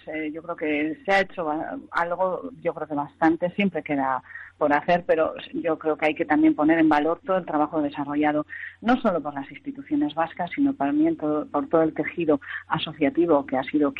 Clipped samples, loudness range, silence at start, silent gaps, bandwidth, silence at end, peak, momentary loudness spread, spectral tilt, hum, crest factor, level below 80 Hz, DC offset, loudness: under 0.1%; 3 LU; 0.05 s; none; 6.8 kHz; 0 s; -8 dBFS; 10 LU; -7.5 dB/octave; none; 16 dB; -60 dBFS; under 0.1%; -24 LUFS